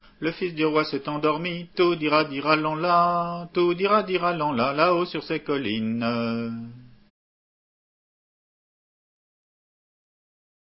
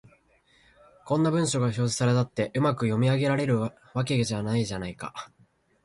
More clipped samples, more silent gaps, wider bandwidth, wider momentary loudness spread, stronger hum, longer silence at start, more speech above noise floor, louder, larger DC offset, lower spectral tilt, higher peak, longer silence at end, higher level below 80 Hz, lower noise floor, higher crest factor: neither; neither; second, 5.8 kHz vs 11.5 kHz; second, 8 LU vs 11 LU; neither; second, 0.2 s vs 1.05 s; first, over 66 dB vs 37 dB; about the same, -24 LUFS vs -26 LUFS; neither; first, -10 dB/octave vs -6 dB/octave; first, -2 dBFS vs -12 dBFS; first, 3.9 s vs 0.6 s; about the same, -62 dBFS vs -58 dBFS; first, under -90 dBFS vs -63 dBFS; first, 24 dB vs 16 dB